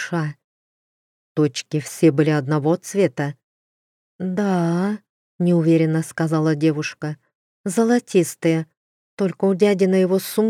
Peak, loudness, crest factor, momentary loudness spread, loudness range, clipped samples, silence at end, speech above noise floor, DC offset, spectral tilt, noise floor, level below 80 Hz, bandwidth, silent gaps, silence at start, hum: -4 dBFS; -20 LUFS; 16 dB; 12 LU; 2 LU; under 0.1%; 0 s; over 71 dB; under 0.1%; -6.5 dB/octave; under -90 dBFS; -72 dBFS; 15.5 kHz; 0.44-1.35 s, 3.44-4.19 s, 5.09-5.39 s, 7.35-7.64 s, 8.77-9.17 s; 0 s; none